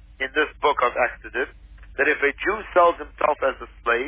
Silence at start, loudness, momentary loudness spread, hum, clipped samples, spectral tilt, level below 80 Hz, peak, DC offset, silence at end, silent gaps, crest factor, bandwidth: 0.2 s; -22 LUFS; 10 LU; none; under 0.1%; -7 dB/octave; -46 dBFS; -6 dBFS; under 0.1%; 0 s; none; 18 dB; 3.8 kHz